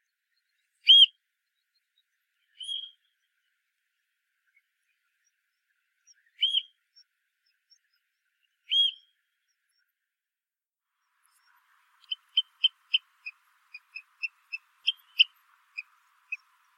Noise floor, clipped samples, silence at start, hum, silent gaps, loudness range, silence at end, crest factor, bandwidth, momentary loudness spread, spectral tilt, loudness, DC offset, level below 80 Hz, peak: under -90 dBFS; under 0.1%; 0.85 s; none; none; 20 LU; 0.4 s; 26 dB; 14.5 kHz; 27 LU; 10 dB/octave; -23 LUFS; under 0.1%; under -90 dBFS; -8 dBFS